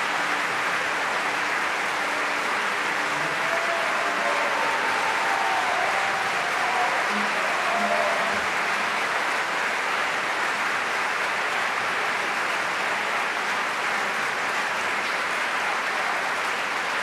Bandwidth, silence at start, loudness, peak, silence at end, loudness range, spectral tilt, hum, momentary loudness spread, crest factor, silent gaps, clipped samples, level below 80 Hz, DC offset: 15 kHz; 0 s; -24 LUFS; -10 dBFS; 0 s; 2 LU; -1.5 dB/octave; none; 2 LU; 14 dB; none; under 0.1%; -68 dBFS; under 0.1%